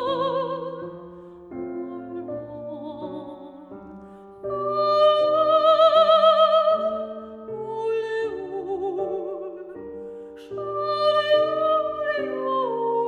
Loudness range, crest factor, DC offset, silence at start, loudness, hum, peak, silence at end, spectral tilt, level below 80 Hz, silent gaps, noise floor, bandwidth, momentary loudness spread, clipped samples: 16 LU; 18 dB; under 0.1%; 0 s; -22 LUFS; none; -6 dBFS; 0 s; -5.5 dB/octave; -64 dBFS; none; -43 dBFS; 7 kHz; 23 LU; under 0.1%